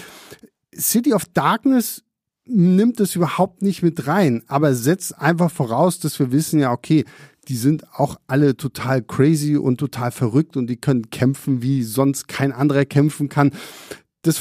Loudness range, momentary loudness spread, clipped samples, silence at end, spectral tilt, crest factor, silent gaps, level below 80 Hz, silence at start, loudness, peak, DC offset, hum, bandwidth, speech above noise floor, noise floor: 2 LU; 7 LU; under 0.1%; 0 s; -6 dB/octave; 18 dB; none; -58 dBFS; 0 s; -19 LUFS; -2 dBFS; under 0.1%; none; 15.5 kHz; 27 dB; -45 dBFS